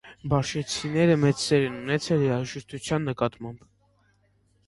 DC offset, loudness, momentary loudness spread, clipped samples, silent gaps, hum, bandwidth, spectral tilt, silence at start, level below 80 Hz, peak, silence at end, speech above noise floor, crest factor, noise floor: under 0.1%; -25 LUFS; 11 LU; under 0.1%; none; 50 Hz at -50 dBFS; 11.5 kHz; -5.5 dB/octave; 0.05 s; -54 dBFS; -8 dBFS; 1.1 s; 40 dB; 18 dB; -65 dBFS